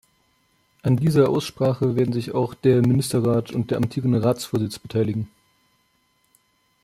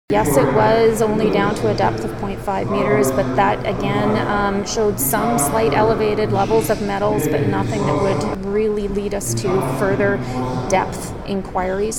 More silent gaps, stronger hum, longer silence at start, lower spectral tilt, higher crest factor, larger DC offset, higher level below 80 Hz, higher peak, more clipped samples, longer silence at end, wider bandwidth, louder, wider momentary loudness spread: neither; neither; first, 0.85 s vs 0.1 s; first, -7 dB/octave vs -5.5 dB/octave; about the same, 18 dB vs 16 dB; second, under 0.1% vs 0.8%; second, -56 dBFS vs -36 dBFS; second, -6 dBFS vs -2 dBFS; neither; first, 1.55 s vs 0 s; second, 14.5 kHz vs 18.5 kHz; second, -22 LUFS vs -18 LUFS; about the same, 8 LU vs 7 LU